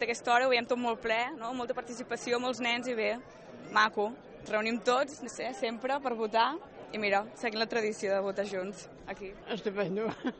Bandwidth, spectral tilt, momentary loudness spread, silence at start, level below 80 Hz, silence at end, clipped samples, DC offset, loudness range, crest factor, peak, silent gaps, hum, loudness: 8.4 kHz; -3.5 dB/octave; 14 LU; 0 s; -66 dBFS; 0 s; under 0.1%; under 0.1%; 2 LU; 18 dB; -14 dBFS; none; none; -32 LUFS